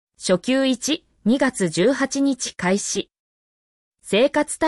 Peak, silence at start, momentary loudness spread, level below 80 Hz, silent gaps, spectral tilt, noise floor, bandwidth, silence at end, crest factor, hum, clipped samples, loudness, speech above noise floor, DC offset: -6 dBFS; 0.2 s; 5 LU; -60 dBFS; 3.20-3.92 s; -4 dB/octave; under -90 dBFS; 12 kHz; 0 s; 16 dB; none; under 0.1%; -21 LUFS; over 70 dB; under 0.1%